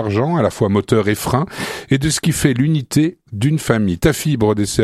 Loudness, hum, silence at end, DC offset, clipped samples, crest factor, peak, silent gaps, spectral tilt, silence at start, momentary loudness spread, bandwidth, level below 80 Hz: -17 LUFS; none; 0 s; under 0.1%; under 0.1%; 16 dB; 0 dBFS; none; -5.5 dB/octave; 0 s; 4 LU; 15 kHz; -38 dBFS